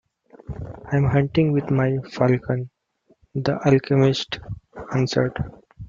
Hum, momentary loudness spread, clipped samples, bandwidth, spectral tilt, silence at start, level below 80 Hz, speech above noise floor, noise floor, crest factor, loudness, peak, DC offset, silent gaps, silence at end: none; 16 LU; under 0.1%; 7.4 kHz; -7.5 dB/octave; 0.5 s; -48 dBFS; 42 dB; -62 dBFS; 18 dB; -22 LUFS; -4 dBFS; under 0.1%; none; 0 s